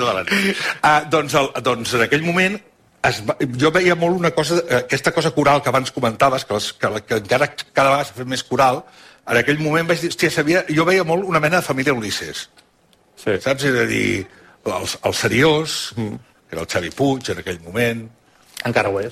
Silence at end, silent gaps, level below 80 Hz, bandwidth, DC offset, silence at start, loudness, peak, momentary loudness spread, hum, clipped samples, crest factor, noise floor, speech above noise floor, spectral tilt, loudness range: 0 s; none; -52 dBFS; 16 kHz; under 0.1%; 0 s; -18 LUFS; -2 dBFS; 10 LU; none; under 0.1%; 16 dB; -57 dBFS; 38 dB; -4.5 dB/octave; 4 LU